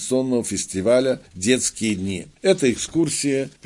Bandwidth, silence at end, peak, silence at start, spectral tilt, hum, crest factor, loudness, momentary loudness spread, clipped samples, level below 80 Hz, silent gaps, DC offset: 11.5 kHz; 0.15 s; -4 dBFS; 0 s; -4 dB/octave; none; 18 dB; -21 LUFS; 6 LU; under 0.1%; -54 dBFS; none; under 0.1%